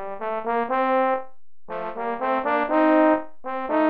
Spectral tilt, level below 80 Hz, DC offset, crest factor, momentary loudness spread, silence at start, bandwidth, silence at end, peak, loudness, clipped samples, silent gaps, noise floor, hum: -8 dB/octave; -60 dBFS; 1%; 16 dB; 13 LU; 0 s; 5 kHz; 0 s; -8 dBFS; -23 LUFS; under 0.1%; none; -45 dBFS; none